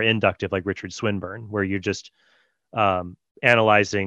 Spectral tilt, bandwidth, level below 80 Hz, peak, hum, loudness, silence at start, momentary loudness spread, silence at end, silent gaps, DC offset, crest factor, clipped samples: -5 dB/octave; 10.5 kHz; -58 dBFS; -2 dBFS; none; -22 LUFS; 0 s; 13 LU; 0 s; 3.31-3.35 s; under 0.1%; 22 dB; under 0.1%